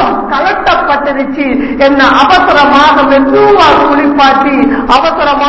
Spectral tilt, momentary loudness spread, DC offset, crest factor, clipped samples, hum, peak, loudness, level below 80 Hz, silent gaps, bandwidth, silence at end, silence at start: -5 dB/octave; 6 LU; under 0.1%; 6 dB; 1%; none; 0 dBFS; -7 LUFS; -32 dBFS; none; 8 kHz; 0 s; 0 s